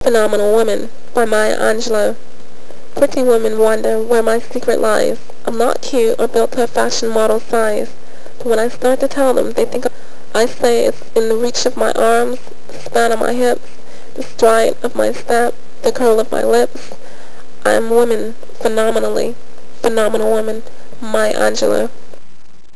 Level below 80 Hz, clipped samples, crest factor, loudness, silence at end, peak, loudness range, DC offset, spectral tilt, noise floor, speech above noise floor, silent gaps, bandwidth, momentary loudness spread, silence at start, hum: -58 dBFS; under 0.1%; 16 dB; -15 LUFS; 0 s; 0 dBFS; 2 LU; 20%; -3.5 dB/octave; -40 dBFS; 25 dB; none; 11 kHz; 10 LU; 0 s; none